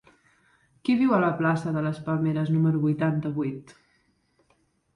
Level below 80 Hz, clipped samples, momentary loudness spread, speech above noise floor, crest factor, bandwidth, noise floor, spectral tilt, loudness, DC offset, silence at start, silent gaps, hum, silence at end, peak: -64 dBFS; under 0.1%; 9 LU; 44 dB; 16 dB; 10.5 kHz; -68 dBFS; -9 dB/octave; -25 LUFS; under 0.1%; 0.85 s; none; none; 1.35 s; -10 dBFS